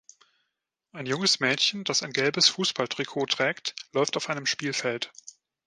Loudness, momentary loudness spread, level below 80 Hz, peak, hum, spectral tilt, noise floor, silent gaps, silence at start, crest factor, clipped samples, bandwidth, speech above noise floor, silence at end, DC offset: -25 LUFS; 10 LU; -76 dBFS; -6 dBFS; none; -2 dB/octave; -82 dBFS; none; 0.95 s; 22 dB; under 0.1%; 11 kHz; 55 dB; 0.35 s; under 0.1%